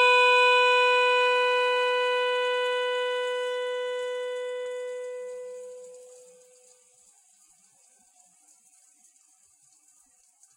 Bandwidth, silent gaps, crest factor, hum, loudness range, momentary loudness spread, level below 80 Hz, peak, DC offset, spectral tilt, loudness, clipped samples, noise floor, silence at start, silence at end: 11.5 kHz; none; 18 dB; none; 20 LU; 20 LU; under -90 dBFS; -10 dBFS; under 0.1%; 2.5 dB/octave; -24 LUFS; under 0.1%; -62 dBFS; 0 s; 4.5 s